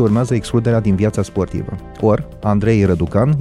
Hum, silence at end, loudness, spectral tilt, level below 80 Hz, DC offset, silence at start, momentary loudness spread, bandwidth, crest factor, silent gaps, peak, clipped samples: none; 0 s; -17 LUFS; -8 dB/octave; -36 dBFS; under 0.1%; 0 s; 7 LU; 11.5 kHz; 14 dB; none; -2 dBFS; under 0.1%